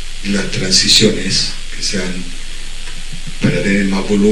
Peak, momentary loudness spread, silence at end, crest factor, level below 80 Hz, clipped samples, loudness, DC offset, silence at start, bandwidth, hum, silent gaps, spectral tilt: 0 dBFS; 20 LU; 0 s; 14 dB; -24 dBFS; under 0.1%; -14 LUFS; under 0.1%; 0 s; 15 kHz; none; none; -3.5 dB/octave